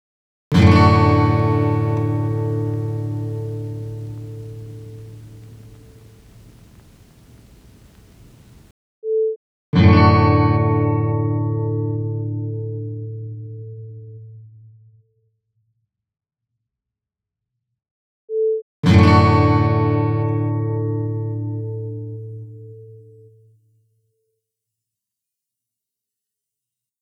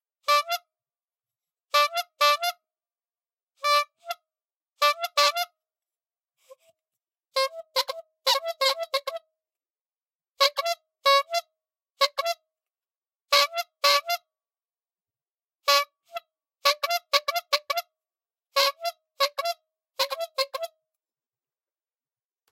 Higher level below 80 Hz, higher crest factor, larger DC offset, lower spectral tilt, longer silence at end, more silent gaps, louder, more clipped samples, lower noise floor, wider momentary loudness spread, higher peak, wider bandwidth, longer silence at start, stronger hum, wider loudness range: first, -44 dBFS vs -90 dBFS; second, 20 dB vs 26 dB; neither; first, -8.5 dB/octave vs 4 dB/octave; first, 4 s vs 1.85 s; first, 8.71-9.02 s, 9.36-9.73 s, 17.91-18.28 s, 18.62-18.83 s vs 4.56-4.60 s, 10.15-10.19 s, 12.98-13.02 s; first, -18 LUFS vs -25 LUFS; neither; second, -85 dBFS vs under -90 dBFS; first, 23 LU vs 13 LU; about the same, 0 dBFS vs -2 dBFS; second, 8 kHz vs 16.5 kHz; first, 0.5 s vs 0.3 s; neither; first, 20 LU vs 3 LU